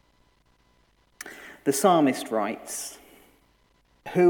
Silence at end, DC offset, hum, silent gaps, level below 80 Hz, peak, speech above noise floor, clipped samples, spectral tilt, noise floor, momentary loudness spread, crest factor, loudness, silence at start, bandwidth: 0 s; under 0.1%; none; none; -68 dBFS; -6 dBFS; 40 dB; under 0.1%; -4.5 dB/octave; -64 dBFS; 22 LU; 20 dB; -25 LUFS; 1.25 s; 19 kHz